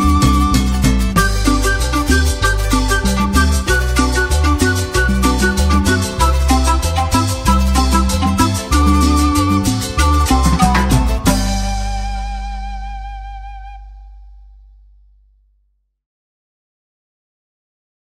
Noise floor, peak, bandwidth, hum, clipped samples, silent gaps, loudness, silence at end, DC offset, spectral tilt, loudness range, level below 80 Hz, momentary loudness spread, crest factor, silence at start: -62 dBFS; 0 dBFS; 16 kHz; 50 Hz at -30 dBFS; under 0.1%; none; -15 LUFS; 3.75 s; under 0.1%; -4.5 dB/octave; 13 LU; -18 dBFS; 12 LU; 14 dB; 0 s